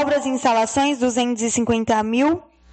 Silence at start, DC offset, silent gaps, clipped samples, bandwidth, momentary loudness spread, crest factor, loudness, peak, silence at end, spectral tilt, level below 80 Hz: 0 s; under 0.1%; none; under 0.1%; 9 kHz; 3 LU; 12 dB; -20 LUFS; -6 dBFS; 0.3 s; -3.5 dB/octave; -50 dBFS